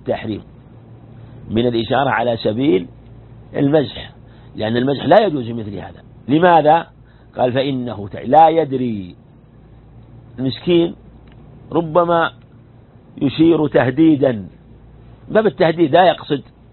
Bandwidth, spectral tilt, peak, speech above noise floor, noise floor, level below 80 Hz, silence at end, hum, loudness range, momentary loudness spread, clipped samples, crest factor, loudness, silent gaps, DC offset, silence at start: 4.3 kHz; -10.5 dB/octave; 0 dBFS; 29 dB; -44 dBFS; -48 dBFS; 0.3 s; none; 5 LU; 17 LU; under 0.1%; 18 dB; -16 LUFS; none; under 0.1%; 0.05 s